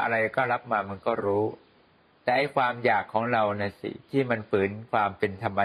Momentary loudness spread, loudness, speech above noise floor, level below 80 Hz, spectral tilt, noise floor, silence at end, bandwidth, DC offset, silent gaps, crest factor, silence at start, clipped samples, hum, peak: 5 LU; -27 LUFS; 34 dB; -68 dBFS; -7.5 dB/octave; -61 dBFS; 0 s; 12 kHz; under 0.1%; none; 18 dB; 0 s; under 0.1%; none; -10 dBFS